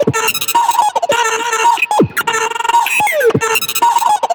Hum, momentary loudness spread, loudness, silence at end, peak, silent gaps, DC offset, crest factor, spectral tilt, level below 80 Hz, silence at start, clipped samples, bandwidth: none; 2 LU; -13 LUFS; 0 s; -2 dBFS; none; under 0.1%; 12 dB; -2.5 dB/octave; -54 dBFS; 0 s; under 0.1%; over 20 kHz